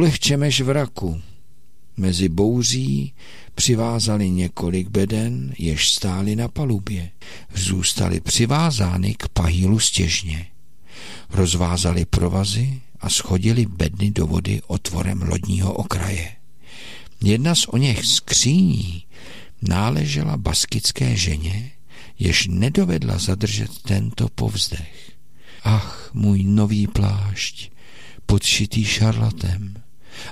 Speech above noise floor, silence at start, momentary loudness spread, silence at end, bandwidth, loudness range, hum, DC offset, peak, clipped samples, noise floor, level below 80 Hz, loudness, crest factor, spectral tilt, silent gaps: 37 dB; 0 s; 13 LU; 0 s; 15.5 kHz; 3 LU; none; 2%; -4 dBFS; under 0.1%; -57 dBFS; -36 dBFS; -20 LUFS; 16 dB; -4.5 dB/octave; none